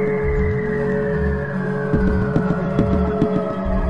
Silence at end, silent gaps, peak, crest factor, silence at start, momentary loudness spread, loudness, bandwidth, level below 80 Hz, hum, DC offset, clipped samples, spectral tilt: 0 s; none; -4 dBFS; 14 dB; 0 s; 4 LU; -20 LUFS; 6.2 kHz; -28 dBFS; none; 1%; under 0.1%; -9.5 dB/octave